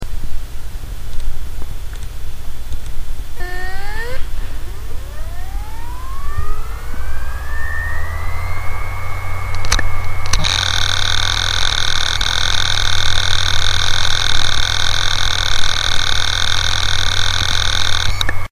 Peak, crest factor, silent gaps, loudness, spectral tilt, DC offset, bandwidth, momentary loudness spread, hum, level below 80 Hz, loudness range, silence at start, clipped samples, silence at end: 0 dBFS; 12 dB; none; -17 LUFS; -1.5 dB/octave; under 0.1%; 14 kHz; 15 LU; none; -22 dBFS; 13 LU; 0 s; under 0.1%; 0.05 s